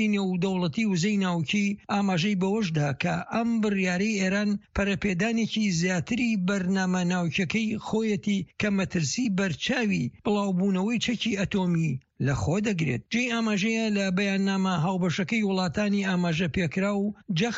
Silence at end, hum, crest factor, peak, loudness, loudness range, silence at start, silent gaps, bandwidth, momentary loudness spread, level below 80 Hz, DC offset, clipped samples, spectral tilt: 0 s; none; 14 dB; -12 dBFS; -26 LUFS; 1 LU; 0 s; none; 8 kHz; 3 LU; -52 dBFS; under 0.1%; under 0.1%; -5.5 dB/octave